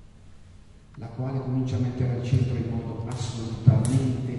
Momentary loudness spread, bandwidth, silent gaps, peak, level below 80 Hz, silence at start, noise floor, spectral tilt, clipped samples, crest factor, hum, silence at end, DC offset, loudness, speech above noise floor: 11 LU; 11.5 kHz; none; -4 dBFS; -44 dBFS; 0 s; -49 dBFS; -7.5 dB/octave; under 0.1%; 22 dB; none; 0 s; under 0.1%; -26 LUFS; 24 dB